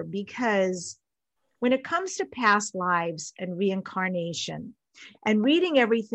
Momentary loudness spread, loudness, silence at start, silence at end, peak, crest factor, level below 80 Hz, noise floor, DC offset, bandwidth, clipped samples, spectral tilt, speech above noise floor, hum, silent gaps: 13 LU; -26 LUFS; 0 s; 0 s; -8 dBFS; 18 dB; -74 dBFS; -80 dBFS; under 0.1%; 8.8 kHz; under 0.1%; -4.5 dB/octave; 54 dB; none; none